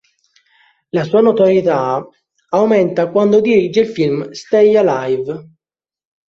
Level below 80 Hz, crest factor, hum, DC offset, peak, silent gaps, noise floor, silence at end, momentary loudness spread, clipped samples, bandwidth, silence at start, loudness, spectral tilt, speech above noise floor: -58 dBFS; 14 dB; none; under 0.1%; -2 dBFS; none; -85 dBFS; 0.85 s; 10 LU; under 0.1%; 7.4 kHz; 0.95 s; -14 LUFS; -7 dB/octave; 72 dB